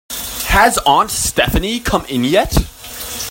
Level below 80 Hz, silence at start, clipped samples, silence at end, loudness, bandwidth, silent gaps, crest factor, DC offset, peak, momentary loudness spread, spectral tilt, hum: -26 dBFS; 0.1 s; under 0.1%; 0 s; -15 LUFS; 16.5 kHz; none; 16 dB; under 0.1%; 0 dBFS; 12 LU; -3.5 dB/octave; none